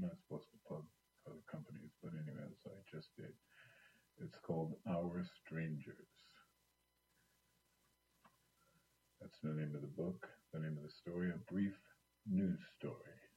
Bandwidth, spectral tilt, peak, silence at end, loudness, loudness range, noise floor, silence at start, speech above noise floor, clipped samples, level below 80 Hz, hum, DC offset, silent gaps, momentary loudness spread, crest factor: 13 kHz; -8.5 dB/octave; -30 dBFS; 0.1 s; -47 LUFS; 10 LU; -82 dBFS; 0 s; 37 dB; under 0.1%; -80 dBFS; none; under 0.1%; none; 19 LU; 20 dB